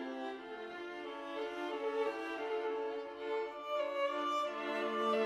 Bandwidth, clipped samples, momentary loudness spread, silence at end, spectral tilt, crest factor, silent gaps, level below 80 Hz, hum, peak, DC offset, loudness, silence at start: 13 kHz; under 0.1%; 9 LU; 0 s; -3.5 dB/octave; 16 dB; none; -80 dBFS; none; -22 dBFS; under 0.1%; -39 LUFS; 0 s